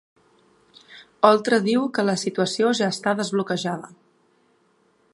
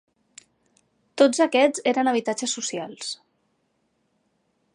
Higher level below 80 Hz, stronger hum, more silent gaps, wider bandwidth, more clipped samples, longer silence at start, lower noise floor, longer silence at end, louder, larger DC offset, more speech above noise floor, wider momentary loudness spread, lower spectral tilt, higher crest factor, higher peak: first, -74 dBFS vs -82 dBFS; neither; neither; about the same, 11.5 kHz vs 11.5 kHz; neither; second, 0.9 s vs 1.15 s; second, -63 dBFS vs -71 dBFS; second, 1.3 s vs 1.6 s; about the same, -21 LUFS vs -22 LUFS; neither; second, 42 dB vs 49 dB; second, 8 LU vs 14 LU; first, -4.5 dB/octave vs -2.5 dB/octave; about the same, 22 dB vs 20 dB; first, -2 dBFS vs -6 dBFS